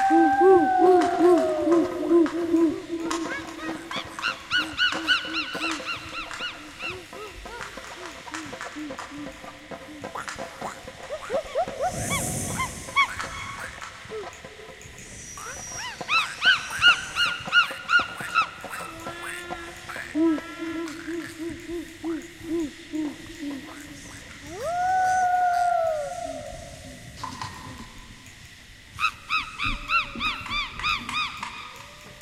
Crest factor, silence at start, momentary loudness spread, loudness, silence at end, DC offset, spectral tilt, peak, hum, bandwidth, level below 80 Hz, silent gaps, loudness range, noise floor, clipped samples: 20 dB; 0 s; 20 LU; -25 LUFS; 0 s; under 0.1%; -3 dB/octave; -6 dBFS; none; 15.5 kHz; -50 dBFS; none; 12 LU; -47 dBFS; under 0.1%